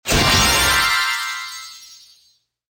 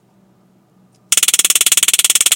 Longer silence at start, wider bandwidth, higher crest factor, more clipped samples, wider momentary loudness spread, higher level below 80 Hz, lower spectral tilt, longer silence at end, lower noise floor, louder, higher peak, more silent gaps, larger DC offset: second, 0.05 s vs 1.1 s; second, 17 kHz vs over 20 kHz; about the same, 16 dB vs 16 dB; second, under 0.1% vs 0.2%; first, 18 LU vs 3 LU; first, -34 dBFS vs -58 dBFS; first, -2 dB/octave vs 3.5 dB/octave; first, 0.75 s vs 0 s; first, -60 dBFS vs -53 dBFS; second, -15 LUFS vs -10 LUFS; second, -4 dBFS vs 0 dBFS; neither; neither